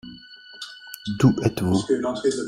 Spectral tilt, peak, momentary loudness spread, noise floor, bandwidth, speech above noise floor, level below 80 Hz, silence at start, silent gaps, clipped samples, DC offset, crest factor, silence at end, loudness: -6.5 dB/octave; -4 dBFS; 22 LU; -44 dBFS; 16 kHz; 23 dB; -54 dBFS; 0.05 s; none; under 0.1%; under 0.1%; 20 dB; 0 s; -22 LUFS